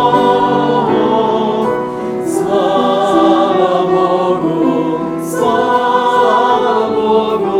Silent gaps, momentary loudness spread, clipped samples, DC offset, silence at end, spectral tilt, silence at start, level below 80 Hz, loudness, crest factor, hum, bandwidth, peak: none; 6 LU; under 0.1%; under 0.1%; 0 s; -6 dB/octave; 0 s; -50 dBFS; -13 LUFS; 12 dB; none; 15.5 kHz; 0 dBFS